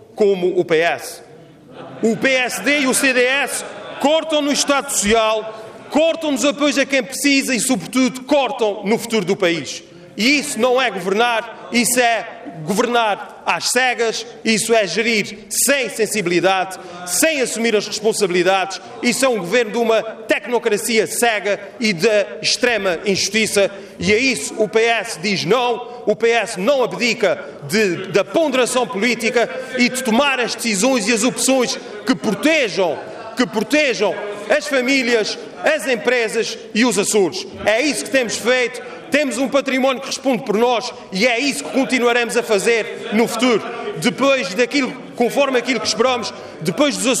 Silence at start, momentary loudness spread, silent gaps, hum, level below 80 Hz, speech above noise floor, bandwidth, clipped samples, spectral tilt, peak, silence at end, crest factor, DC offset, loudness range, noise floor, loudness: 0.15 s; 6 LU; none; none; -56 dBFS; 24 dB; 15.5 kHz; under 0.1%; -3 dB/octave; -4 dBFS; 0 s; 14 dB; under 0.1%; 1 LU; -42 dBFS; -17 LUFS